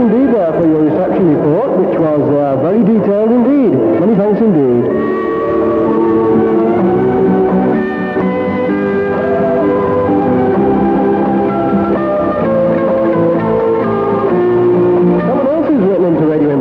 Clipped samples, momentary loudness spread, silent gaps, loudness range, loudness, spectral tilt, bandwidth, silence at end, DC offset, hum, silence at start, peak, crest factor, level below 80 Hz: under 0.1%; 3 LU; none; 2 LU; -12 LUFS; -10.5 dB/octave; 5 kHz; 0 s; under 0.1%; none; 0 s; -2 dBFS; 10 dB; -42 dBFS